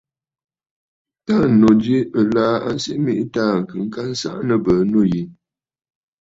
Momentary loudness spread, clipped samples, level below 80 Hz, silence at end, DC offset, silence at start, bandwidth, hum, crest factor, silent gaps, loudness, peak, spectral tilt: 12 LU; under 0.1%; -50 dBFS; 0.9 s; under 0.1%; 1.3 s; 7.8 kHz; none; 16 dB; none; -18 LUFS; -2 dBFS; -7 dB/octave